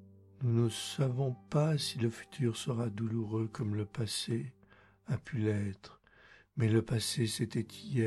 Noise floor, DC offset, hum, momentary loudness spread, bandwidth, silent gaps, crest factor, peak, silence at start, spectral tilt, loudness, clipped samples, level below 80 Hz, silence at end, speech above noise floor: -63 dBFS; under 0.1%; none; 8 LU; 13 kHz; none; 18 dB; -16 dBFS; 0 s; -6 dB/octave; -34 LUFS; under 0.1%; -66 dBFS; 0 s; 30 dB